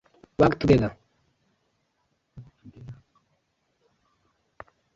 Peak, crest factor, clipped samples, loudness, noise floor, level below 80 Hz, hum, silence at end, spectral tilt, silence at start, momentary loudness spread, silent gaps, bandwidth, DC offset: -4 dBFS; 26 dB; under 0.1%; -22 LUFS; -74 dBFS; -50 dBFS; none; 2.05 s; -8 dB/octave; 0.4 s; 26 LU; none; 7.6 kHz; under 0.1%